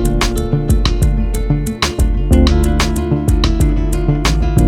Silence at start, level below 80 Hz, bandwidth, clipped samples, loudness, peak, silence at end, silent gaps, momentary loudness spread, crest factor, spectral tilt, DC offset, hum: 0 s; -16 dBFS; 15 kHz; under 0.1%; -15 LUFS; 0 dBFS; 0 s; none; 5 LU; 12 dB; -5.5 dB/octave; under 0.1%; none